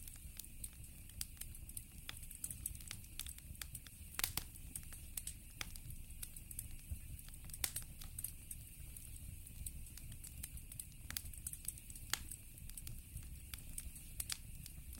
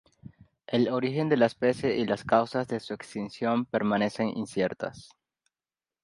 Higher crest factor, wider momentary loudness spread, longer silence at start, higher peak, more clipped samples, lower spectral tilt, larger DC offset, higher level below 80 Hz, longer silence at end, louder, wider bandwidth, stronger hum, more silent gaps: first, 32 dB vs 20 dB; about the same, 10 LU vs 10 LU; second, 0 s vs 0.7 s; second, -18 dBFS vs -8 dBFS; neither; second, -1.5 dB/octave vs -6.5 dB/octave; neither; first, -54 dBFS vs -66 dBFS; second, 0 s vs 1 s; second, -48 LUFS vs -28 LUFS; first, 19 kHz vs 11.5 kHz; neither; neither